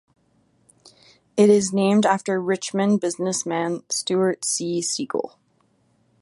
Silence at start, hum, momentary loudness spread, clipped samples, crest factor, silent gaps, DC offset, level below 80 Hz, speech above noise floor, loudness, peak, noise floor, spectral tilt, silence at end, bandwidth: 1.35 s; none; 9 LU; under 0.1%; 20 dB; none; under 0.1%; -68 dBFS; 43 dB; -21 LUFS; -4 dBFS; -64 dBFS; -4.5 dB/octave; 0.95 s; 11.5 kHz